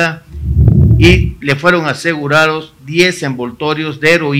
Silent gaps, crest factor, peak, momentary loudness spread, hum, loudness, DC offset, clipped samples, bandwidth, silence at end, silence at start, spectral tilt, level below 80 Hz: none; 12 dB; 0 dBFS; 11 LU; none; -12 LUFS; under 0.1%; 0.7%; 15.5 kHz; 0 s; 0 s; -6 dB/octave; -22 dBFS